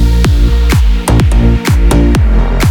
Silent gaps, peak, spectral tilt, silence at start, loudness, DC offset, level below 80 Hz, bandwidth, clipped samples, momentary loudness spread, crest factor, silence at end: none; 0 dBFS; -6 dB/octave; 0 s; -10 LUFS; under 0.1%; -8 dBFS; 16.5 kHz; under 0.1%; 2 LU; 8 dB; 0 s